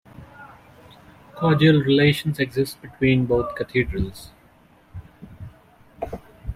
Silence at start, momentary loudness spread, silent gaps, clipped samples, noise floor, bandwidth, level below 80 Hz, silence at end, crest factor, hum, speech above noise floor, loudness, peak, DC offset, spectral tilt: 0.2 s; 26 LU; none; under 0.1%; -54 dBFS; 15.5 kHz; -42 dBFS; 0 s; 18 dB; none; 34 dB; -21 LUFS; -4 dBFS; under 0.1%; -7 dB/octave